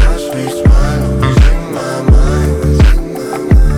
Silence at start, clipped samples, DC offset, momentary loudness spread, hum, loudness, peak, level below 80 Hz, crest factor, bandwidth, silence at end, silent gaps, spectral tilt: 0 s; under 0.1%; under 0.1%; 8 LU; none; -12 LUFS; 0 dBFS; -10 dBFS; 8 dB; 14 kHz; 0 s; none; -7 dB/octave